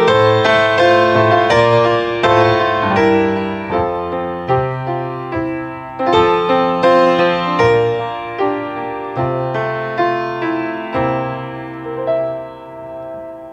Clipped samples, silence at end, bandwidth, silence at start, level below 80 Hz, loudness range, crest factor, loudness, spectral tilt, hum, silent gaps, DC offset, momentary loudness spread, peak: under 0.1%; 0 s; 9.2 kHz; 0 s; -46 dBFS; 7 LU; 14 dB; -15 LUFS; -6.5 dB/octave; none; none; under 0.1%; 14 LU; 0 dBFS